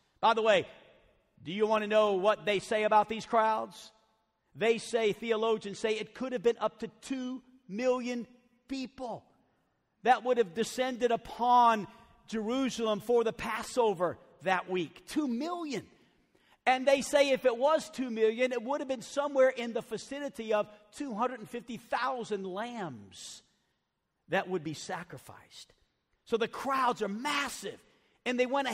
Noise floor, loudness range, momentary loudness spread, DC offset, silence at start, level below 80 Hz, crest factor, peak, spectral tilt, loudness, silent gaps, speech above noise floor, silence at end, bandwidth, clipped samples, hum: -82 dBFS; 8 LU; 15 LU; under 0.1%; 0.2 s; -70 dBFS; 18 dB; -12 dBFS; -4 dB/octave; -31 LUFS; none; 51 dB; 0 s; 16 kHz; under 0.1%; none